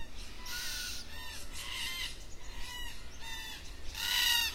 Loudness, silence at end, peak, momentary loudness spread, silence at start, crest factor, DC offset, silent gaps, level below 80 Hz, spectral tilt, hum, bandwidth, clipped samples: -36 LUFS; 0 s; -16 dBFS; 17 LU; 0 s; 22 dB; under 0.1%; none; -48 dBFS; 0 dB/octave; none; 16 kHz; under 0.1%